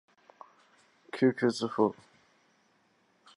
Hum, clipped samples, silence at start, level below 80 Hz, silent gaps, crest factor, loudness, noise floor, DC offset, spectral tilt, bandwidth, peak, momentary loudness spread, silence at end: none; under 0.1%; 1.15 s; -78 dBFS; none; 22 dB; -29 LUFS; -69 dBFS; under 0.1%; -6 dB/octave; 11 kHz; -12 dBFS; 16 LU; 1.45 s